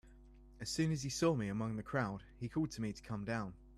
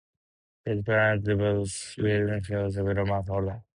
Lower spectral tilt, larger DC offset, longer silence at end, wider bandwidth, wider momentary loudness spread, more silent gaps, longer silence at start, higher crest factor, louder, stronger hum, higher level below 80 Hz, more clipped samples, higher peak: about the same, -5.5 dB/octave vs -6 dB/octave; neither; second, 0 s vs 0.15 s; first, 13.5 kHz vs 11 kHz; about the same, 9 LU vs 8 LU; neither; second, 0.05 s vs 0.65 s; about the same, 18 dB vs 16 dB; second, -39 LUFS vs -27 LUFS; neither; second, -60 dBFS vs -46 dBFS; neither; second, -22 dBFS vs -12 dBFS